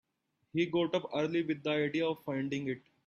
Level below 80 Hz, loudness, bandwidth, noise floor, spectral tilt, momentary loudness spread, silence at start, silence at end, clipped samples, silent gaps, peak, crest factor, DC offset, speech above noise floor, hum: -76 dBFS; -34 LUFS; 13.5 kHz; -80 dBFS; -6.5 dB/octave; 6 LU; 0.55 s; 0.3 s; under 0.1%; none; -18 dBFS; 16 dB; under 0.1%; 47 dB; none